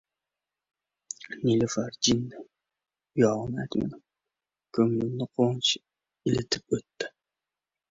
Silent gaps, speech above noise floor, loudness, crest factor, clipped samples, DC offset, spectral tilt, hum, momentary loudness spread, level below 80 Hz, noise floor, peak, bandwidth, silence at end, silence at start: none; 63 dB; -28 LUFS; 20 dB; under 0.1%; under 0.1%; -4.5 dB/octave; none; 13 LU; -60 dBFS; -90 dBFS; -10 dBFS; 8 kHz; 0.8 s; 1.3 s